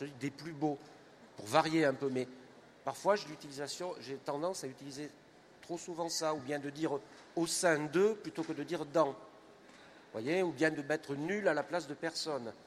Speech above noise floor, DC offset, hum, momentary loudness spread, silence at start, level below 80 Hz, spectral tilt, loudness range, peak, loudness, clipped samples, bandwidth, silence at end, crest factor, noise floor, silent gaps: 23 dB; under 0.1%; none; 14 LU; 0 s; -80 dBFS; -4 dB/octave; 5 LU; -12 dBFS; -36 LUFS; under 0.1%; 15 kHz; 0.05 s; 24 dB; -58 dBFS; none